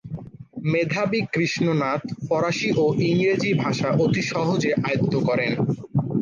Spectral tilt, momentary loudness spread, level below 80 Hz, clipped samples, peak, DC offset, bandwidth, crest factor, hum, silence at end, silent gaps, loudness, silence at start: -6.5 dB/octave; 5 LU; -56 dBFS; under 0.1%; -10 dBFS; under 0.1%; 9.2 kHz; 12 dB; none; 0 s; none; -22 LUFS; 0.05 s